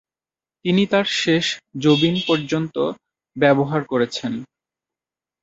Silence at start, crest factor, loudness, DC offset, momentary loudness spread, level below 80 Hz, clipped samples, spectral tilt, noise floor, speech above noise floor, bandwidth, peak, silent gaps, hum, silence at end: 0.65 s; 20 dB; -20 LUFS; under 0.1%; 12 LU; -60 dBFS; under 0.1%; -5.5 dB/octave; under -90 dBFS; over 71 dB; 8 kHz; -2 dBFS; none; none; 1 s